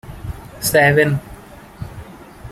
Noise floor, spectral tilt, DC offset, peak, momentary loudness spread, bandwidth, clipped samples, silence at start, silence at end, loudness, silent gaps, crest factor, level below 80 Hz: -39 dBFS; -4.5 dB/octave; under 0.1%; -2 dBFS; 26 LU; 16 kHz; under 0.1%; 0.05 s; 0 s; -15 LUFS; none; 18 dB; -40 dBFS